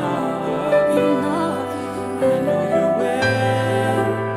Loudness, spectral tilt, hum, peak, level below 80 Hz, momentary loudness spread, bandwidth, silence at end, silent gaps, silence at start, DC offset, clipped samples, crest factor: -19 LUFS; -6.5 dB/octave; none; -6 dBFS; -54 dBFS; 6 LU; 15 kHz; 0 s; none; 0 s; under 0.1%; under 0.1%; 14 dB